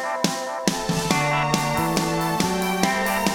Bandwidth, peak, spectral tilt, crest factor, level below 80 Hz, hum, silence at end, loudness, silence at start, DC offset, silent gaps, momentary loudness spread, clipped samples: 19.5 kHz; -2 dBFS; -4 dB/octave; 20 dB; -46 dBFS; none; 0 s; -22 LUFS; 0 s; under 0.1%; none; 3 LU; under 0.1%